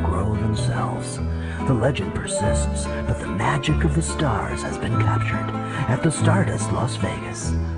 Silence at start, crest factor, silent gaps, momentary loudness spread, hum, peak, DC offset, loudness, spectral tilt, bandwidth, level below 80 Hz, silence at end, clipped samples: 0 s; 14 dB; none; 6 LU; none; -6 dBFS; under 0.1%; -23 LUFS; -6 dB/octave; 11 kHz; -30 dBFS; 0 s; under 0.1%